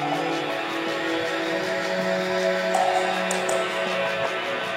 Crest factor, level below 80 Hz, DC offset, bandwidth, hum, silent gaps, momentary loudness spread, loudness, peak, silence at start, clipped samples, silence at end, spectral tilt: 18 dB; -68 dBFS; under 0.1%; 16.5 kHz; none; none; 4 LU; -24 LUFS; -6 dBFS; 0 s; under 0.1%; 0 s; -3.5 dB/octave